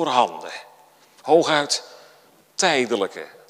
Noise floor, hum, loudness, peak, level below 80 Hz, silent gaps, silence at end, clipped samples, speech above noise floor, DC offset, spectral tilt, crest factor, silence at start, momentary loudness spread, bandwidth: -54 dBFS; none; -21 LUFS; -2 dBFS; -78 dBFS; none; 0.25 s; under 0.1%; 33 dB; under 0.1%; -2.5 dB/octave; 20 dB; 0 s; 18 LU; 15.5 kHz